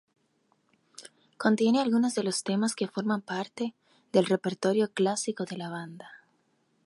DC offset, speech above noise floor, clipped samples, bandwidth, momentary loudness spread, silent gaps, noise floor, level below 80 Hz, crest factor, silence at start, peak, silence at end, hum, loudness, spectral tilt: under 0.1%; 43 dB; under 0.1%; 11.5 kHz; 15 LU; none; -71 dBFS; -80 dBFS; 20 dB; 1 s; -10 dBFS; 0.7 s; none; -28 LUFS; -5 dB/octave